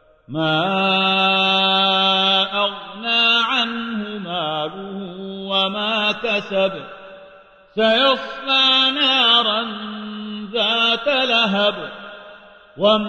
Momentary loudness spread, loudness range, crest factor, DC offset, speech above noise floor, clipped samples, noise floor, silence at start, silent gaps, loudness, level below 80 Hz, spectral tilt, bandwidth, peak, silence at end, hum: 16 LU; 6 LU; 16 dB; under 0.1%; 29 dB; under 0.1%; -47 dBFS; 0.3 s; none; -17 LUFS; -60 dBFS; -4.5 dB/octave; 9.8 kHz; -2 dBFS; 0 s; none